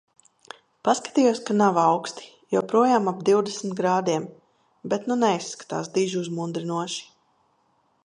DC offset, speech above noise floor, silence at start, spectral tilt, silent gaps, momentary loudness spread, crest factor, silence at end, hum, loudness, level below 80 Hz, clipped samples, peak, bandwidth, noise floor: under 0.1%; 44 dB; 0.85 s; -5 dB/octave; none; 12 LU; 18 dB; 1 s; none; -24 LUFS; -74 dBFS; under 0.1%; -6 dBFS; 10.5 kHz; -67 dBFS